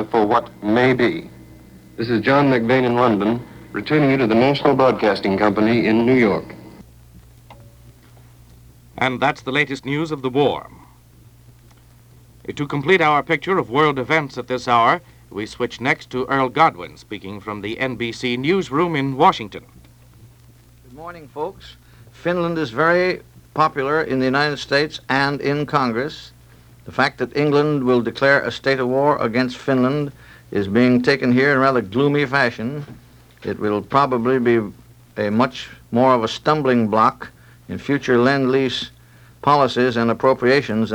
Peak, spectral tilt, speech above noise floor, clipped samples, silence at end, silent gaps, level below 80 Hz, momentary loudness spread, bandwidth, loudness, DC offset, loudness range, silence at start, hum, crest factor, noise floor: -2 dBFS; -6.5 dB/octave; 30 dB; under 0.1%; 0 s; none; -52 dBFS; 14 LU; 19.5 kHz; -18 LUFS; under 0.1%; 6 LU; 0 s; none; 18 dB; -48 dBFS